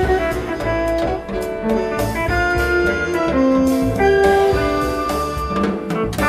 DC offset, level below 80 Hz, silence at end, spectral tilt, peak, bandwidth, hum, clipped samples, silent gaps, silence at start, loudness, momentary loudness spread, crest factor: under 0.1%; -30 dBFS; 0 s; -6 dB/octave; -4 dBFS; 15 kHz; none; under 0.1%; none; 0 s; -18 LUFS; 8 LU; 14 dB